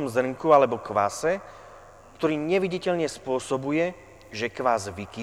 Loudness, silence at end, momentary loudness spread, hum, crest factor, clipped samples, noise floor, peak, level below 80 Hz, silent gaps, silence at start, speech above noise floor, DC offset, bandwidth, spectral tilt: -25 LUFS; 0 s; 12 LU; none; 20 dB; under 0.1%; -48 dBFS; -6 dBFS; -58 dBFS; none; 0 s; 23 dB; under 0.1%; 14.5 kHz; -5 dB/octave